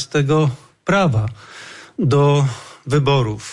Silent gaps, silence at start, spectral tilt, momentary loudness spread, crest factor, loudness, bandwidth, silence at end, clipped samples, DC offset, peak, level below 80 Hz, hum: none; 0 s; -6.5 dB/octave; 18 LU; 12 dB; -18 LUFS; 11 kHz; 0 s; under 0.1%; under 0.1%; -6 dBFS; -46 dBFS; none